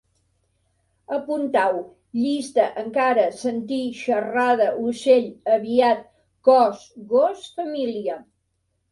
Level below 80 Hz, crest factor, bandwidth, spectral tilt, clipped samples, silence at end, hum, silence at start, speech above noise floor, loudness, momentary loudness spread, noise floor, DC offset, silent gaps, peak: -68 dBFS; 18 dB; 11.5 kHz; -4.5 dB/octave; under 0.1%; 0.7 s; none; 1.1 s; 52 dB; -22 LUFS; 11 LU; -72 dBFS; under 0.1%; none; -4 dBFS